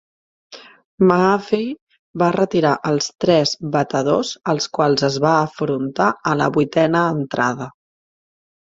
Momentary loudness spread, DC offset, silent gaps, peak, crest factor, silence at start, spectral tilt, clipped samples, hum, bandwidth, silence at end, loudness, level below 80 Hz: 6 LU; under 0.1%; 0.84-0.98 s, 1.81-1.87 s, 1.99-2.14 s; 0 dBFS; 18 dB; 0.5 s; -5.5 dB/octave; under 0.1%; none; 7.8 kHz; 0.9 s; -18 LUFS; -58 dBFS